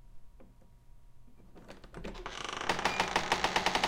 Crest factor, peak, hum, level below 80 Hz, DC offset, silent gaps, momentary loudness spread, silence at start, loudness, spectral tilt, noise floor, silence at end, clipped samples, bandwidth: 26 dB; -10 dBFS; none; -52 dBFS; under 0.1%; none; 21 LU; 0 s; -32 LUFS; -2.5 dB/octave; -55 dBFS; 0 s; under 0.1%; 16.5 kHz